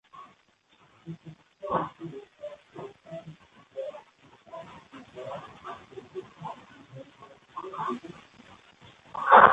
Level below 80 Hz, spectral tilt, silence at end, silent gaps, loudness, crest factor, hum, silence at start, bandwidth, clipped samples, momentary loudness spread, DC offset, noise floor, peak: -66 dBFS; -6 dB/octave; 0 s; none; -29 LUFS; 30 dB; none; 0.15 s; 8.4 kHz; under 0.1%; 19 LU; under 0.1%; -64 dBFS; 0 dBFS